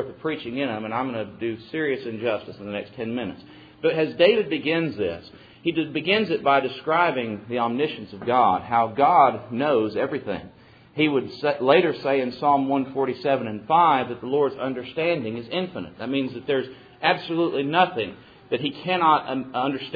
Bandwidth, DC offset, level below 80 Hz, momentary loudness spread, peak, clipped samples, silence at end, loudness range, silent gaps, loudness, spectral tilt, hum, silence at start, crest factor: 5 kHz; under 0.1%; -64 dBFS; 12 LU; -4 dBFS; under 0.1%; 0 s; 4 LU; none; -23 LUFS; -8 dB/octave; none; 0 s; 20 dB